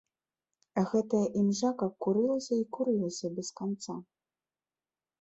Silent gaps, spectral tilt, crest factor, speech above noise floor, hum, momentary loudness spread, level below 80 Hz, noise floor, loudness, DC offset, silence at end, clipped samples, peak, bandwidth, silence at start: none; -6 dB/octave; 16 dB; over 60 dB; none; 9 LU; -72 dBFS; under -90 dBFS; -31 LUFS; under 0.1%; 1.2 s; under 0.1%; -16 dBFS; 8.2 kHz; 0.75 s